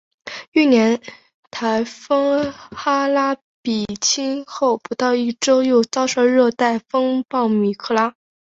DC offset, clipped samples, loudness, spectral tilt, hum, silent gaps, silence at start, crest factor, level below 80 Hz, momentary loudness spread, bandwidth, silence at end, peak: under 0.1%; under 0.1%; -19 LUFS; -3.5 dB/octave; none; 0.48-0.52 s, 1.34-1.51 s, 3.42-3.64 s; 0.25 s; 16 dB; -60 dBFS; 10 LU; 8 kHz; 0.35 s; -2 dBFS